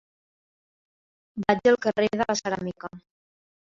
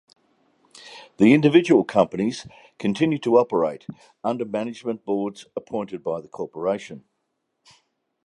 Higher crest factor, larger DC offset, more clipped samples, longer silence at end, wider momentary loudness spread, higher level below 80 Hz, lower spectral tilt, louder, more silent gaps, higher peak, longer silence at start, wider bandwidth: about the same, 24 dB vs 20 dB; neither; neither; second, 0.7 s vs 1.3 s; about the same, 19 LU vs 20 LU; about the same, -62 dBFS vs -64 dBFS; second, -4.5 dB/octave vs -6.5 dB/octave; second, -25 LUFS vs -22 LUFS; neither; about the same, -4 dBFS vs -2 dBFS; first, 1.35 s vs 0.85 s; second, 7.6 kHz vs 11 kHz